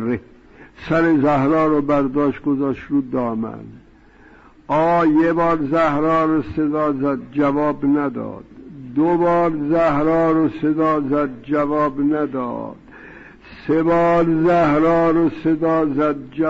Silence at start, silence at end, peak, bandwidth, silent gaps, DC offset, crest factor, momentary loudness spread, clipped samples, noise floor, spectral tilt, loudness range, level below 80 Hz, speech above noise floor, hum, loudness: 0 s; 0 s; -8 dBFS; 7.2 kHz; none; under 0.1%; 10 dB; 10 LU; under 0.1%; -47 dBFS; -9 dB/octave; 3 LU; -46 dBFS; 30 dB; none; -18 LUFS